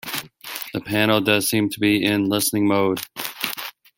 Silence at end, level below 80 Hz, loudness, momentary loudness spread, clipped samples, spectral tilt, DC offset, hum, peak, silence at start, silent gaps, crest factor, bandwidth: 0.3 s; -60 dBFS; -21 LUFS; 12 LU; under 0.1%; -4 dB/octave; under 0.1%; none; -2 dBFS; 0.05 s; none; 20 dB; 17 kHz